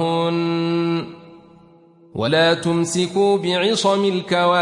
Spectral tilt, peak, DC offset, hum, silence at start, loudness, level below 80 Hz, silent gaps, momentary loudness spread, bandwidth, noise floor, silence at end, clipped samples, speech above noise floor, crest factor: -5 dB/octave; -6 dBFS; under 0.1%; none; 0 s; -19 LUFS; -62 dBFS; none; 8 LU; 11.5 kHz; -49 dBFS; 0 s; under 0.1%; 32 dB; 14 dB